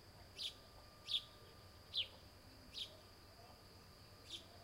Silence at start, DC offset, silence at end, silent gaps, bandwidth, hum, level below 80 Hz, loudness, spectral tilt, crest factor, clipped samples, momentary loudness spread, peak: 0 s; under 0.1%; 0 s; none; 16 kHz; none; -70 dBFS; -46 LUFS; -2 dB/octave; 24 dB; under 0.1%; 18 LU; -28 dBFS